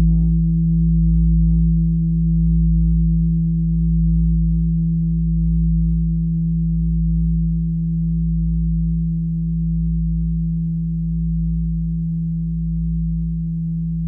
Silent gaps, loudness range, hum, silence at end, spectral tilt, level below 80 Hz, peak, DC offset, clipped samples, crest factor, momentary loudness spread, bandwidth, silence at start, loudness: none; 5 LU; none; 0 s; -15 dB/octave; -22 dBFS; -8 dBFS; under 0.1%; under 0.1%; 10 dB; 6 LU; 0.4 kHz; 0 s; -19 LUFS